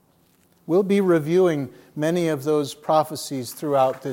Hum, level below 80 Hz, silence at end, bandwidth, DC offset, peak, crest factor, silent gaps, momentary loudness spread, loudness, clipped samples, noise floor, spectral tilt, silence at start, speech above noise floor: none; -74 dBFS; 0 s; 17 kHz; under 0.1%; -6 dBFS; 16 dB; none; 10 LU; -22 LUFS; under 0.1%; -60 dBFS; -6 dB/octave; 0.7 s; 39 dB